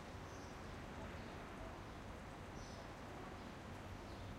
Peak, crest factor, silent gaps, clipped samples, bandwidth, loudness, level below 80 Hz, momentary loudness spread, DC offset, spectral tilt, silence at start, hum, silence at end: -38 dBFS; 14 dB; none; under 0.1%; 16 kHz; -52 LUFS; -60 dBFS; 2 LU; under 0.1%; -5.5 dB/octave; 0 s; none; 0 s